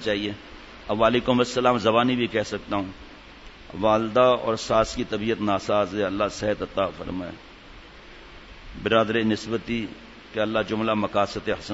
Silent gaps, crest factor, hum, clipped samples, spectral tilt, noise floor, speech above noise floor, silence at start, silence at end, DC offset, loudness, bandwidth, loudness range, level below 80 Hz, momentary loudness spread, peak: none; 20 dB; none; under 0.1%; -5.5 dB/octave; -45 dBFS; 22 dB; 0 s; 0 s; under 0.1%; -24 LUFS; 8 kHz; 5 LU; -48 dBFS; 23 LU; -6 dBFS